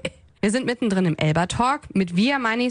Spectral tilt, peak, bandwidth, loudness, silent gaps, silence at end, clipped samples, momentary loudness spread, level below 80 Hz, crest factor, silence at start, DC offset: -5.5 dB/octave; -6 dBFS; 10.5 kHz; -22 LUFS; none; 0 s; under 0.1%; 3 LU; -48 dBFS; 16 dB; 0.05 s; under 0.1%